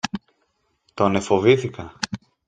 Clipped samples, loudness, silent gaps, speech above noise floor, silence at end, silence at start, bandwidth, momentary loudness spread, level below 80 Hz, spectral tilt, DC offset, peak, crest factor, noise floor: under 0.1%; -21 LUFS; none; 50 dB; 0.3 s; 0.05 s; 9.4 kHz; 16 LU; -56 dBFS; -5.5 dB/octave; under 0.1%; -2 dBFS; 22 dB; -69 dBFS